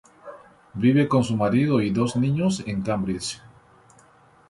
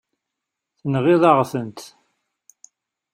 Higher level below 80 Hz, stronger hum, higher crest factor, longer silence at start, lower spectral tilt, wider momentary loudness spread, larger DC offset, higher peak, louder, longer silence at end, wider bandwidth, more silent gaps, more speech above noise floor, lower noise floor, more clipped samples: first, -54 dBFS vs -64 dBFS; neither; about the same, 16 dB vs 20 dB; second, 0.25 s vs 0.85 s; about the same, -6.5 dB/octave vs -7 dB/octave; about the same, 20 LU vs 19 LU; neither; second, -8 dBFS vs -2 dBFS; second, -23 LUFS vs -18 LUFS; second, 1.1 s vs 1.25 s; second, 11.5 kHz vs 15.5 kHz; neither; second, 33 dB vs 65 dB; second, -55 dBFS vs -83 dBFS; neither